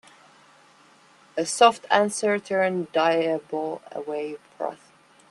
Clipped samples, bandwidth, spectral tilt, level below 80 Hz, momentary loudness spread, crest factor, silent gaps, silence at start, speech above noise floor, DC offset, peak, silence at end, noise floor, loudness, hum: under 0.1%; 12.5 kHz; -3.5 dB/octave; -76 dBFS; 15 LU; 24 dB; none; 1.35 s; 32 dB; under 0.1%; -2 dBFS; 0.55 s; -55 dBFS; -24 LUFS; none